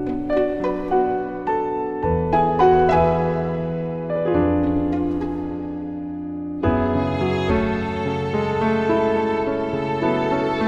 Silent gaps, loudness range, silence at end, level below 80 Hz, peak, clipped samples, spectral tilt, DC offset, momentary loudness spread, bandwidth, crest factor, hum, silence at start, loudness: none; 4 LU; 0 s; -38 dBFS; -6 dBFS; under 0.1%; -8.5 dB/octave; under 0.1%; 9 LU; 8 kHz; 14 dB; none; 0 s; -21 LUFS